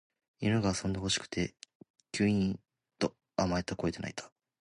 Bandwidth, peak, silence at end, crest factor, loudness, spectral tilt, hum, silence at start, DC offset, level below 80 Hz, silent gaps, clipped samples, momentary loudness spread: 11 kHz; -14 dBFS; 0.35 s; 20 dB; -33 LUFS; -5 dB/octave; none; 0.4 s; under 0.1%; -54 dBFS; 1.75-1.80 s, 1.90-1.94 s; under 0.1%; 11 LU